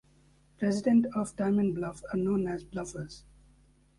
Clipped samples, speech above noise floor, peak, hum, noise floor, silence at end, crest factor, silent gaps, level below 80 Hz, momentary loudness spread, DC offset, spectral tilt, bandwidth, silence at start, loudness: under 0.1%; 34 dB; -14 dBFS; none; -63 dBFS; 0.8 s; 16 dB; none; -58 dBFS; 15 LU; under 0.1%; -7 dB/octave; 11.5 kHz; 0.6 s; -30 LUFS